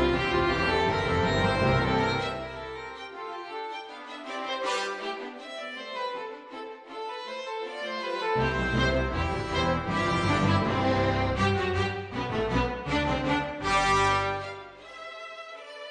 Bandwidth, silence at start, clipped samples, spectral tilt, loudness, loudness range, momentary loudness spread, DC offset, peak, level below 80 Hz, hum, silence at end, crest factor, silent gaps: 10 kHz; 0 s; under 0.1%; -5.5 dB/octave; -28 LUFS; 8 LU; 15 LU; under 0.1%; -12 dBFS; -42 dBFS; none; 0 s; 16 dB; none